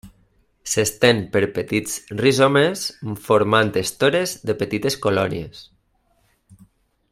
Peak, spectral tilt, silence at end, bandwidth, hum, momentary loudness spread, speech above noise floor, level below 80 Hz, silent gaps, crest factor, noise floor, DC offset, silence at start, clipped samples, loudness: 0 dBFS; -4 dB/octave; 1.5 s; 16 kHz; none; 11 LU; 44 dB; -54 dBFS; none; 20 dB; -64 dBFS; under 0.1%; 0.05 s; under 0.1%; -20 LUFS